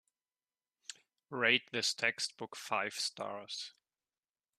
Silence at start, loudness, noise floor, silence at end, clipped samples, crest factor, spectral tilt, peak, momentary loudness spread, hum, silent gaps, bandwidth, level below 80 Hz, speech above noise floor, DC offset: 0.9 s; -34 LUFS; under -90 dBFS; 0.9 s; under 0.1%; 26 dB; -1.5 dB/octave; -14 dBFS; 21 LU; none; none; 14 kHz; -84 dBFS; over 53 dB; under 0.1%